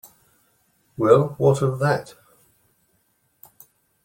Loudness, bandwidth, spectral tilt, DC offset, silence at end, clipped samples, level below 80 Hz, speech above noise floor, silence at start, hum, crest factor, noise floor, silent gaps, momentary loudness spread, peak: -20 LUFS; 16.5 kHz; -7.5 dB/octave; under 0.1%; 2 s; under 0.1%; -60 dBFS; 48 dB; 1 s; none; 22 dB; -67 dBFS; none; 9 LU; -2 dBFS